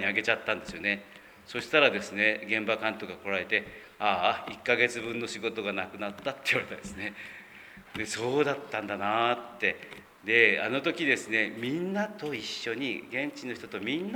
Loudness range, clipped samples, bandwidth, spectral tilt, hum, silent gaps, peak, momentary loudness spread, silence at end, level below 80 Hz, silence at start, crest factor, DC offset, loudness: 5 LU; under 0.1%; over 20 kHz; -4 dB/octave; none; none; -6 dBFS; 13 LU; 0 s; -66 dBFS; 0 s; 24 dB; under 0.1%; -29 LUFS